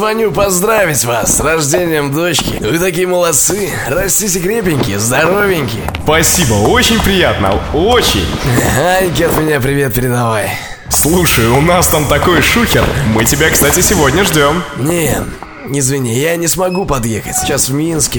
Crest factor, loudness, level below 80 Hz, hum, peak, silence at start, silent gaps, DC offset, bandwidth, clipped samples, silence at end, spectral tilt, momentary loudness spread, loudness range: 12 dB; -11 LUFS; -26 dBFS; none; 0 dBFS; 0 s; none; 0.2%; over 20 kHz; under 0.1%; 0 s; -3.5 dB/octave; 6 LU; 3 LU